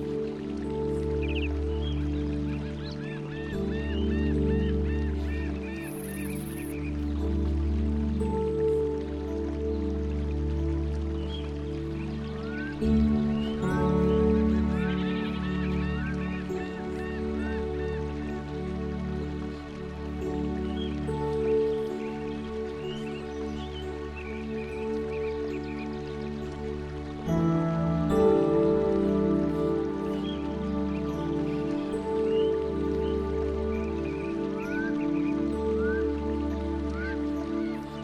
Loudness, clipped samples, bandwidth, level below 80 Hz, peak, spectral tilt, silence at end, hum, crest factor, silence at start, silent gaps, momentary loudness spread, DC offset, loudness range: -30 LUFS; under 0.1%; 13.5 kHz; -36 dBFS; -12 dBFS; -8 dB/octave; 0 s; none; 18 dB; 0 s; none; 10 LU; under 0.1%; 7 LU